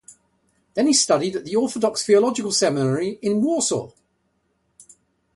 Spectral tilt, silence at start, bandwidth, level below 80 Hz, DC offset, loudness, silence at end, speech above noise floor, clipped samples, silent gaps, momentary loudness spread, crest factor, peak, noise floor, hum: -4 dB/octave; 0.1 s; 11.5 kHz; -64 dBFS; under 0.1%; -20 LUFS; 1.5 s; 49 dB; under 0.1%; none; 6 LU; 18 dB; -6 dBFS; -69 dBFS; none